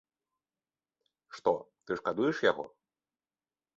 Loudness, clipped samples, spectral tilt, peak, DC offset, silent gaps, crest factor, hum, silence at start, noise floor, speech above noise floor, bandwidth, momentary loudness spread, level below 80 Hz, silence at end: -32 LUFS; under 0.1%; -5.5 dB/octave; -12 dBFS; under 0.1%; none; 22 dB; none; 1.3 s; under -90 dBFS; over 59 dB; 7.6 kHz; 13 LU; -74 dBFS; 1.1 s